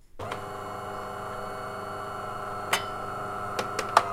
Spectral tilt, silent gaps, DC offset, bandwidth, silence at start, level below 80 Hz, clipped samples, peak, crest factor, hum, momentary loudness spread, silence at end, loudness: -3 dB/octave; none; under 0.1%; 16 kHz; 0.05 s; -54 dBFS; under 0.1%; -2 dBFS; 30 dB; 50 Hz at -50 dBFS; 8 LU; 0 s; -32 LUFS